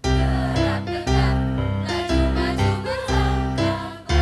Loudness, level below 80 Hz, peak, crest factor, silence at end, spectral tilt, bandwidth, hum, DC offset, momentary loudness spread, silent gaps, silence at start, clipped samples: -22 LUFS; -26 dBFS; -8 dBFS; 12 dB; 0 s; -6 dB/octave; 12 kHz; none; under 0.1%; 4 LU; none; 0.05 s; under 0.1%